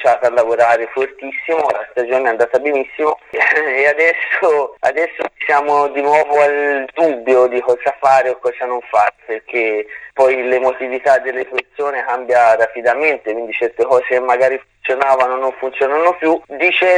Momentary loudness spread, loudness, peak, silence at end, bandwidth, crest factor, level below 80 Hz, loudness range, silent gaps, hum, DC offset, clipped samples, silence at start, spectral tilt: 8 LU; -15 LUFS; 0 dBFS; 0 s; 10 kHz; 14 dB; -62 dBFS; 2 LU; none; none; under 0.1%; under 0.1%; 0 s; -4 dB/octave